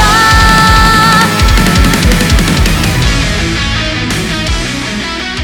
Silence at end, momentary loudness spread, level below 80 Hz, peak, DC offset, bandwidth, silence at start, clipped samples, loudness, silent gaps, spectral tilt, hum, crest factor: 0 s; 9 LU; -14 dBFS; 0 dBFS; 0.3%; over 20 kHz; 0 s; 0.8%; -9 LUFS; none; -4 dB/octave; none; 8 dB